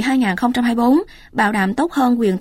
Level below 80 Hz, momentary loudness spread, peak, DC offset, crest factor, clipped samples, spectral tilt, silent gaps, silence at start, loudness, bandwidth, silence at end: -48 dBFS; 3 LU; -4 dBFS; under 0.1%; 12 dB; under 0.1%; -6 dB/octave; none; 0 s; -17 LUFS; 15 kHz; 0 s